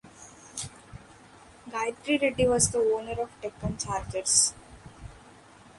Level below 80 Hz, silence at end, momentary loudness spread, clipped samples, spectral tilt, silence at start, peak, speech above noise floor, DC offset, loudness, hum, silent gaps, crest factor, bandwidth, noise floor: -50 dBFS; 0.5 s; 26 LU; under 0.1%; -3 dB/octave; 0.05 s; -8 dBFS; 26 dB; under 0.1%; -27 LUFS; none; none; 22 dB; 11.5 kHz; -53 dBFS